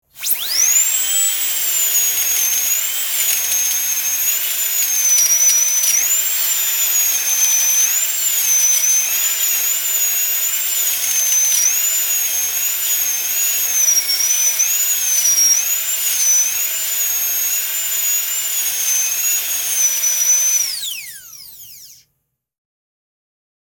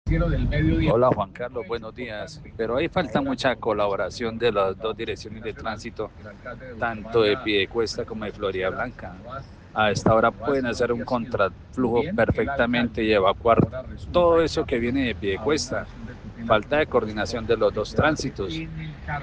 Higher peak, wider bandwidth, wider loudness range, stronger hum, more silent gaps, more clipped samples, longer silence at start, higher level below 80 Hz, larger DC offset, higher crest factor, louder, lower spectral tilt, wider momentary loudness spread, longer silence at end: first, 0 dBFS vs -4 dBFS; first, 19 kHz vs 9.6 kHz; about the same, 3 LU vs 5 LU; neither; neither; neither; about the same, 0.15 s vs 0.05 s; second, -66 dBFS vs -38 dBFS; neither; about the same, 16 dB vs 18 dB; first, -13 LUFS vs -24 LUFS; second, 4 dB/octave vs -6 dB/octave; second, 5 LU vs 15 LU; first, 1.8 s vs 0 s